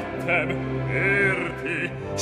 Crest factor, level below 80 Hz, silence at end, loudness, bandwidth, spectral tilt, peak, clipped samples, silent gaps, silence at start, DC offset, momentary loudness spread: 16 dB; -46 dBFS; 0 s; -24 LUFS; 11 kHz; -5.5 dB/octave; -10 dBFS; under 0.1%; none; 0 s; under 0.1%; 8 LU